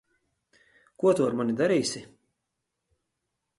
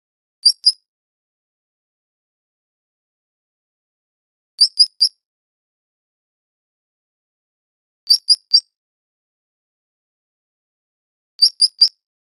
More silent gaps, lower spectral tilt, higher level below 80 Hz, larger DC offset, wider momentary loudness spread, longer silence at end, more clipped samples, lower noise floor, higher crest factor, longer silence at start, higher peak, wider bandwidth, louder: second, none vs 0.88-4.58 s, 5.26-8.07 s, 8.76-11.39 s; first, -5 dB/octave vs 6.5 dB/octave; first, -70 dBFS vs -88 dBFS; neither; first, 8 LU vs 4 LU; first, 1.55 s vs 0.4 s; neither; second, -83 dBFS vs under -90 dBFS; about the same, 18 dB vs 22 dB; first, 1 s vs 0.45 s; second, -10 dBFS vs 0 dBFS; second, 11.5 kHz vs 14 kHz; second, -26 LUFS vs -13 LUFS